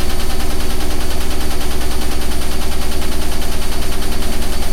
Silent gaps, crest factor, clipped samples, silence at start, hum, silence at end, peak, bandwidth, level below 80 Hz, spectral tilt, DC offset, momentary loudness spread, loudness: none; 8 dB; under 0.1%; 0 s; 60 Hz at -35 dBFS; 0 s; -2 dBFS; 15 kHz; -18 dBFS; -4 dB/octave; 0.2%; 0 LU; -22 LUFS